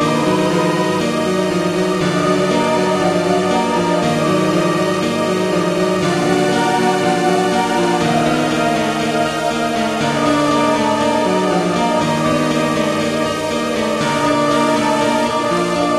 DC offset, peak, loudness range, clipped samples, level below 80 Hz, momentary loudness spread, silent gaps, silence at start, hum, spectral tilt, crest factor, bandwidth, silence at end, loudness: under 0.1%; -2 dBFS; 1 LU; under 0.1%; -46 dBFS; 2 LU; none; 0 s; none; -5 dB/octave; 14 dB; 14.5 kHz; 0 s; -16 LUFS